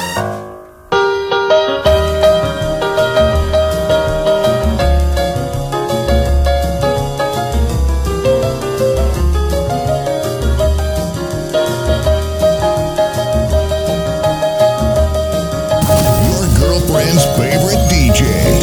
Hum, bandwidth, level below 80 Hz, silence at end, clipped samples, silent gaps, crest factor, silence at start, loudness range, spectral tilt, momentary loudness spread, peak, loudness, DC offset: none; over 20 kHz; -20 dBFS; 0 s; under 0.1%; none; 12 dB; 0 s; 3 LU; -5.5 dB/octave; 6 LU; 0 dBFS; -14 LUFS; under 0.1%